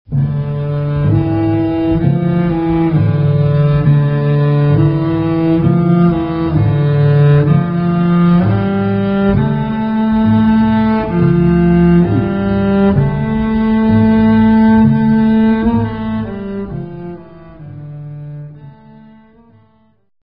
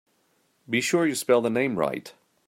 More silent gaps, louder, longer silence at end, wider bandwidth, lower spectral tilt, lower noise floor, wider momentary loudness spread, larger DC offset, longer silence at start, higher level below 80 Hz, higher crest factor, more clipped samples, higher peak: neither; first, -12 LUFS vs -24 LUFS; first, 1.5 s vs 0.35 s; second, 5 kHz vs 16 kHz; first, -11 dB/octave vs -4 dB/octave; second, -52 dBFS vs -68 dBFS; first, 13 LU vs 7 LU; neither; second, 0.1 s vs 0.7 s; first, -32 dBFS vs -68 dBFS; second, 12 dB vs 20 dB; neither; first, 0 dBFS vs -8 dBFS